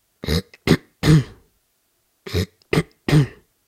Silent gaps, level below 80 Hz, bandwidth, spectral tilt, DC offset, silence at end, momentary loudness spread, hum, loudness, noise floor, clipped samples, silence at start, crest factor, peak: none; -38 dBFS; 15 kHz; -6.5 dB/octave; under 0.1%; 0.4 s; 10 LU; none; -21 LUFS; -67 dBFS; under 0.1%; 0.25 s; 20 dB; 0 dBFS